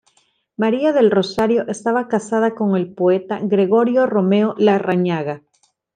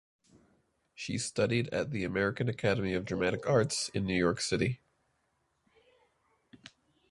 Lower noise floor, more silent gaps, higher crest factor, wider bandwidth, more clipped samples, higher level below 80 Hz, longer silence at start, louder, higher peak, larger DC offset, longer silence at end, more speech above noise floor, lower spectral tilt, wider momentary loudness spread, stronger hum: second, -61 dBFS vs -77 dBFS; neither; second, 14 dB vs 20 dB; second, 9.4 kHz vs 11.5 kHz; neither; about the same, -62 dBFS vs -58 dBFS; second, 0.6 s vs 1 s; first, -17 LUFS vs -31 LUFS; first, -4 dBFS vs -12 dBFS; neither; about the same, 0.6 s vs 0.55 s; about the same, 44 dB vs 46 dB; first, -7 dB/octave vs -5 dB/octave; about the same, 6 LU vs 6 LU; neither